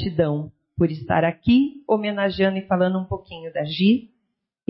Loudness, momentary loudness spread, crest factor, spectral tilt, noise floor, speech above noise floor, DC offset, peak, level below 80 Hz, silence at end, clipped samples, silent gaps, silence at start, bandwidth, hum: -22 LUFS; 11 LU; 14 dB; -11.5 dB/octave; -76 dBFS; 55 dB; under 0.1%; -8 dBFS; -48 dBFS; 0.65 s; under 0.1%; none; 0 s; 5.8 kHz; none